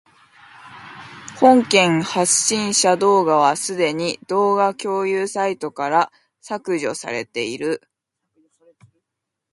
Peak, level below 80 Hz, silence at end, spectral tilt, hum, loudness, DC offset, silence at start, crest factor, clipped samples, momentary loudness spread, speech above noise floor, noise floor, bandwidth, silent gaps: 0 dBFS; -66 dBFS; 1.75 s; -3 dB/octave; none; -18 LUFS; under 0.1%; 0.65 s; 20 dB; under 0.1%; 15 LU; 63 dB; -81 dBFS; 11.5 kHz; none